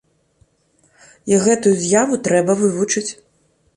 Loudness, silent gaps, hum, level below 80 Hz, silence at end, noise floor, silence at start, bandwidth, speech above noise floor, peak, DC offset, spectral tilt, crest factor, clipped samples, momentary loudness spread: -16 LUFS; none; none; -58 dBFS; 0.65 s; -60 dBFS; 1.25 s; 11.5 kHz; 44 dB; -2 dBFS; under 0.1%; -4.5 dB/octave; 16 dB; under 0.1%; 7 LU